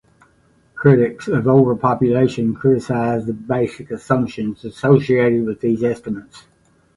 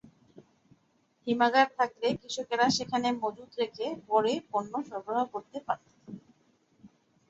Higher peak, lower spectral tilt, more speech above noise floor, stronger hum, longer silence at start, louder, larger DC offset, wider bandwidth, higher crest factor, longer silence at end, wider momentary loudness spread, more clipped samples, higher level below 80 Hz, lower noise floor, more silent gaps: first, 0 dBFS vs -10 dBFS; first, -8.5 dB/octave vs -3.5 dB/octave; about the same, 39 dB vs 41 dB; neither; first, 0.75 s vs 0.35 s; first, -17 LUFS vs -30 LUFS; neither; first, 11.5 kHz vs 8 kHz; about the same, 18 dB vs 22 dB; first, 0.6 s vs 0.4 s; second, 11 LU vs 14 LU; neither; first, -52 dBFS vs -72 dBFS; second, -56 dBFS vs -70 dBFS; neither